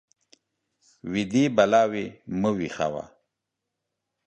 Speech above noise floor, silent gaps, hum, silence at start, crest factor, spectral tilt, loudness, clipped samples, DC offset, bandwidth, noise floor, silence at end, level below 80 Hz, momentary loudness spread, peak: 60 dB; none; none; 1.05 s; 22 dB; -6 dB/octave; -24 LUFS; under 0.1%; under 0.1%; 8.8 kHz; -84 dBFS; 1.2 s; -60 dBFS; 16 LU; -4 dBFS